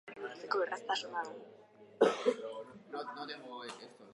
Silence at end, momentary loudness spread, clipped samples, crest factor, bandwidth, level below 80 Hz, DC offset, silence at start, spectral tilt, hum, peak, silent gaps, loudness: 0 s; 17 LU; under 0.1%; 24 dB; 11 kHz; -90 dBFS; under 0.1%; 0.05 s; -3.5 dB/octave; none; -14 dBFS; none; -37 LUFS